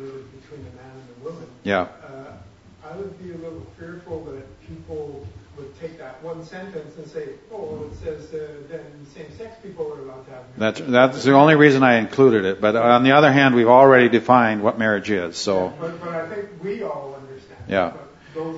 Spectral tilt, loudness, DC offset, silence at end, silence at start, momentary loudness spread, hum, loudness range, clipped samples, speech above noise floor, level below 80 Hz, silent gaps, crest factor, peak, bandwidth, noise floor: -6 dB/octave; -16 LUFS; under 0.1%; 0 s; 0 s; 25 LU; none; 21 LU; under 0.1%; 27 dB; -56 dBFS; none; 20 dB; 0 dBFS; 8 kHz; -46 dBFS